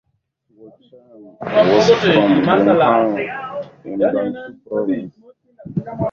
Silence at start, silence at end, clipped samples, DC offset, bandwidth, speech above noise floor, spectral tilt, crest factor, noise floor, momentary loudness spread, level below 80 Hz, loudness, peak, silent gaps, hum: 0.6 s; 0 s; under 0.1%; under 0.1%; 7.4 kHz; 49 dB; -6.5 dB/octave; 18 dB; -66 dBFS; 16 LU; -54 dBFS; -16 LUFS; 0 dBFS; none; none